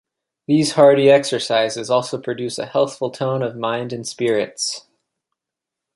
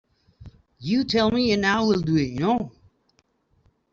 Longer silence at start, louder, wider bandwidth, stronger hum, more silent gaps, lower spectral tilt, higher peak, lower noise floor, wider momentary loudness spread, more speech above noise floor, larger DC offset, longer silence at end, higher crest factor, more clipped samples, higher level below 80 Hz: about the same, 0.5 s vs 0.4 s; first, -18 LUFS vs -22 LUFS; first, 11.5 kHz vs 7.4 kHz; neither; neither; second, -4.5 dB/octave vs -6 dB/octave; first, -2 dBFS vs -8 dBFS; first, -85 dBFS vs -67 dBFS; first, 12 LU vs 6 LU; first, 67 dB vs 45 dB; neither; about the same, 1.15 s vs 1.25 s; about the same, 18 dB vs 16 dB; neither; second, -66 dBFS vs -52 dBFS